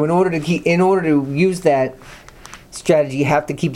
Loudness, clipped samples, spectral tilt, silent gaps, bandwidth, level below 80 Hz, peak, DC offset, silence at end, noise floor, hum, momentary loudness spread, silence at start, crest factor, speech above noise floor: -17 LUFS; under 0.1%; -6.5 dB/octave; none; 14 kHz; -48 dBFS; -2 dBFS; under 0.1%; 0 s; -40 dBFS; none; 5 LU; 0 s; 14 dB; 23 dB